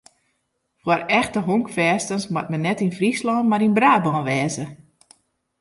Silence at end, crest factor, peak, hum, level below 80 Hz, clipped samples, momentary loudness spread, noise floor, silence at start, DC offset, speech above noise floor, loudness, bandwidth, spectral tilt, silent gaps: 0.85 s; 18 dB; -4 dBFS; none; -60 dBFS; under 0.1%; 9 LU; -72 dBFS; 0.85 s; under 0.1%; 52 dB; -20 LUFS; 11.5 kHz; -5.5 dB/octave; none